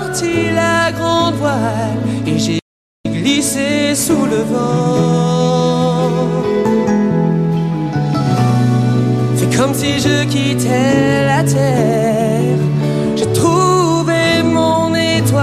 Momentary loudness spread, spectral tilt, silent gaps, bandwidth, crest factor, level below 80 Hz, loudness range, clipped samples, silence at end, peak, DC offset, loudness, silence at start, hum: 4 LU; -5.5 dB/octave; 2.62-3.04 s; 15 kHz; 12 dB; -44 dBFS; 2 LU; under 0.1%; 0 s; -2 dBFS; under 0.1%; -14 LUFS; 0 s; none